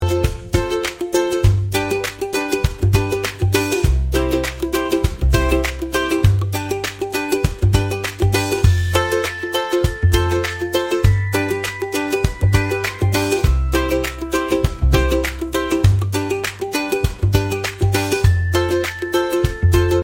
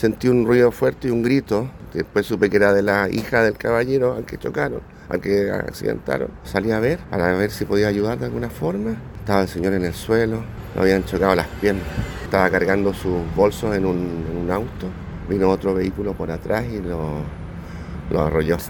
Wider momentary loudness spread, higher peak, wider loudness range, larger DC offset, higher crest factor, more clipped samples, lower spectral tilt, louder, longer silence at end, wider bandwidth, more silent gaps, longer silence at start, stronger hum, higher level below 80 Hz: second, 6 LU vs 11 LU; about the same, 0 dBFS vs 0 dBFS; second, 1 LU vs 4 LU; neither; about the same, 18 dB vs 20 dB; neither; second, -5.5 dB/octave vs -7 dB/octave; about the same, -19 LUFS vs -21 LUFS; about the same, 0 s vs 0 s; about the same, 16.5 kHz vs 18 kHz; neither; about the same, 0 s vs 0 s; neither; first, -26 dBFS vs -38 dBFS